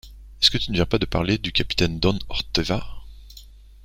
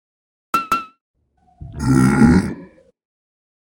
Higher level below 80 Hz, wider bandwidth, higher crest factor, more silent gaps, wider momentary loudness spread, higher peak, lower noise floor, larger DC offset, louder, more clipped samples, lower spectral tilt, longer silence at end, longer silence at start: about the same, -36 dBFS vs -36 dBFS; about the same, 16 kHz vs 17 kHz; about the same, 22 dB vs 20 dB; second, none vs 1.01-1.14 s; second, 8 LU vs 18 LU; about the same, -2 dBFS vs 0 dBFS; about the same, -45 dBFS vs -43 dBFS; neither; second, -22 LUFS vs -17 LUFS; neither; second, -5 dB/octave vs -7 dB/octave; second, 0.25 s vs 1.1 s; second, 0.05 s vs 0.55 s